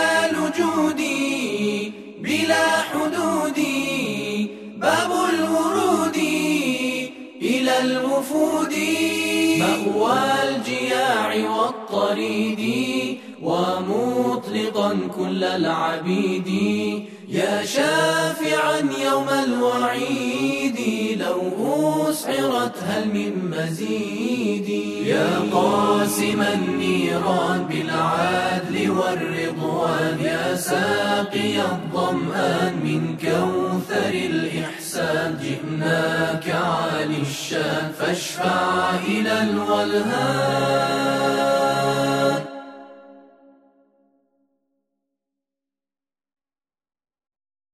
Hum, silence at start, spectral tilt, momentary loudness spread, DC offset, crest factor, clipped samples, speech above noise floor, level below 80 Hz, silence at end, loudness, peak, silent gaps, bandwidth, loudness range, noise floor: none; 0 s; -4.5 dB/octave; 5 LU; under 0.1%; 16 dB; under 0.1%; over 69 dB; -64 dBFS; 4.55 s; -21 LUFS; -6 dBFS; none; 14 kHz; 3 LU; under -90 dBFS